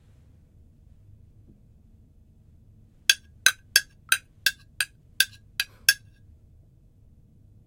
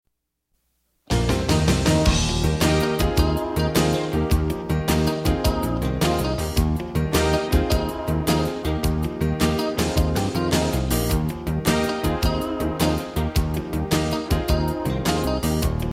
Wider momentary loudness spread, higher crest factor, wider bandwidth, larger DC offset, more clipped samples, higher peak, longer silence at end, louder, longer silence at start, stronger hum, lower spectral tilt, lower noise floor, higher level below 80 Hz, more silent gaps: first, 9 LU vs 5 LU; first, 30 dB vs 16 dB; about the same, 16.5 kHz vs 16.5 kHz; neither; neither; about the same, -2 dBFS vs -4 dBFS; first, 1.7 s vs 0 s; about the same, -24 LUFS vs -22 LUFS; first, 3.1 s vs 1.1 s; neither; second, 2 dB/octave vs -5.5 dB/octave; second, -55 dBFS vs -75 dBFS; second, -58 dBFS vs -28 dBFS; neither